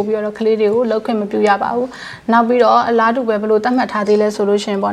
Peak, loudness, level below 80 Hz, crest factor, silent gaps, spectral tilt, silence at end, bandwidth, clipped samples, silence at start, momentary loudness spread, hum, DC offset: 0 dBFS; -15 LUFS; -58 dBFS; 14 dB; none; -5.5 dB/octave; 0 s; 10.5 kHz; under 0.1%; 0 s; 7 LU; none; under 0.1%